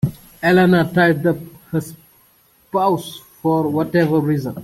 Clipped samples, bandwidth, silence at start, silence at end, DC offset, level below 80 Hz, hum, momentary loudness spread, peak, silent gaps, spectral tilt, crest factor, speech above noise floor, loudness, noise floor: under 0.1%; 16 kHz; 0.05 s; 0 s; under 0.1%; -50 dBFS; none; 11 LU; -4 dBFS; none; -7 dB/octave; 14 dB; 38 dB; -18 LUFS; -55 dBFS